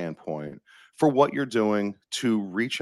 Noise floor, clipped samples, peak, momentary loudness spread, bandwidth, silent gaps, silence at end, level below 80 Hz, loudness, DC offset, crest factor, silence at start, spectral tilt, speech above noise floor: -48 dBFS; under 0.1%; -6 dBFS; 13 LU; 12.5 kHz; none; 0 s; -70 dBFS; -26 LUFS; under 0.1%; 20 dB; 0 s; -5.5 dB/octave; 23 dB